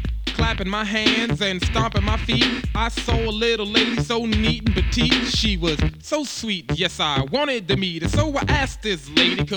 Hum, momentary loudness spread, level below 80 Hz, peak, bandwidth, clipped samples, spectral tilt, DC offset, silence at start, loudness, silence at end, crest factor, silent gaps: none; 6 LU; -30 dBFS; -2 dBFS; 19.5 kHz; under 0.1%; -4.5 dB/octave; under 0.1%; 0 s; -21 LUFS; 0 s; 18 dB; none